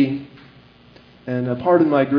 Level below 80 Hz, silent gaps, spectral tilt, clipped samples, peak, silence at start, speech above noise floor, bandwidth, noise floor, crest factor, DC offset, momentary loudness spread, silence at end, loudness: -60 dBFS; none; -10 dB/octave; under 0.1%; -2 dBFS; 0 s; 31 dB; 5.4 kHz; -48 dBFS; 18 dB; under 0.1%; 21 LU; 0 s; -19 LUFS